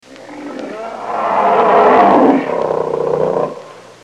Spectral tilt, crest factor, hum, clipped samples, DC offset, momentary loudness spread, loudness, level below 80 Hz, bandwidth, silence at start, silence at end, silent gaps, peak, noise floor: -6.5 dB/octave; 14 dB; none; under 0.1%; 0.1%; 19 LU; -13 LUFS; -56 dBFS; 10 kHz; 0.1 s; 0.25 s; none; 0 dBFS; -34 dBFS